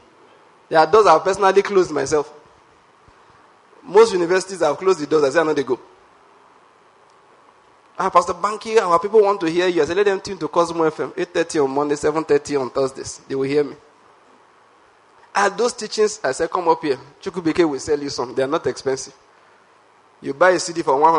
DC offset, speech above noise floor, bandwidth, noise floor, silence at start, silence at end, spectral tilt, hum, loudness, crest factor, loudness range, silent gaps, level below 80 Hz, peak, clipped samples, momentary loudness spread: under 0.1%; 35 dB; 11 kHz; -53 dBFS; 0.7 s; 0 s; -4 dB/octave; none; -19 LUFS; 20 dB; 6 LU; none; -58 dBFS; 0 dBFS; under 0.1%; 10 LU